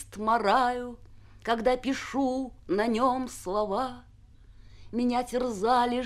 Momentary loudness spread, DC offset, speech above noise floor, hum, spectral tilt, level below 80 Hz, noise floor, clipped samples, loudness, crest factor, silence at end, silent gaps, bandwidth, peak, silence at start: 10 LU; under 0.1%; 25 dB; none; -4.5 dB/octave; -52 dBFS; -53 dBFS; under 0.1%; -28 LUFS; 18 dB; 0 s; none; 14.5 kHz; -10 dBFS; 0 s